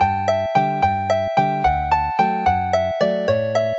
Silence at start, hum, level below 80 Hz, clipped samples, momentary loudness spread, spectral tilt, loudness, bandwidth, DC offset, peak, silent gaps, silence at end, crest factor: 0 s; none; -38 dBFS; under 0.1%; 2 LU; -6 dB/octave; -19 LUFS; 7.8 kHz; under 0.1%; -4 dBFS; none; 0 s; 16 dB